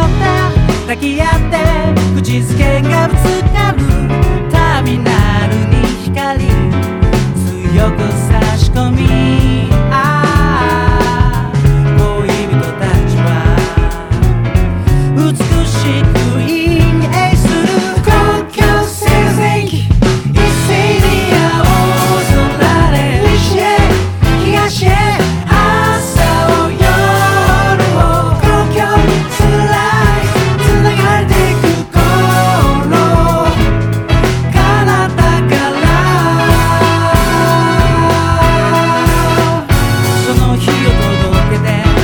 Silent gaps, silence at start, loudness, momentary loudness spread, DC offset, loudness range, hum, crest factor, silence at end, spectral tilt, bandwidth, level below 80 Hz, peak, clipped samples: none; 0 s; -11 LUFS; 3 LU; under 0.1%; 2 LU; none; 10 dB; 0 s; -6 dB/octave; 19.5 kHz; -18 dBFS; 0 dBFS; 0.2%